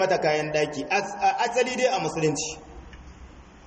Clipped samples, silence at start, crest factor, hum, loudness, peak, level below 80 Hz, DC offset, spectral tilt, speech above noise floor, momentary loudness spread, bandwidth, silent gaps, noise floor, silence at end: under 0.1%; 0 s; 16 dB; none; -25 LUFS; -10 dBFS; -52 dBFS; under 0.1%; -3.5 dB/octave; 22 dB; 12 LU; 8.8 kHz; none; -46 dBFS; 0.05 s